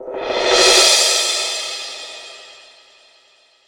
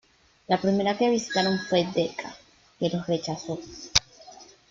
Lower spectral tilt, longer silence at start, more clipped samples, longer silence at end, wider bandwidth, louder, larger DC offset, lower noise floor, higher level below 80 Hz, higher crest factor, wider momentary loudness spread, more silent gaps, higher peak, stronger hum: second, 1.5 dB/octave vs -4 dB/octave; second, 0 s vs 0.5 s; neither; first, 1.15 s vs 0.25 s; first, over 20 kHz vs 7.8 kHz; first, -13 LUFS vs -26 LUFS; neither; first, -54 dBFS vs -49 dBFS; about the same, -52 dBFS vs -54 dBFS; second, 18 dB vs 28 dB; first, 22 LU vs 12 LU; neither; about the same, 0 dBFS vs 0 dBFS; neither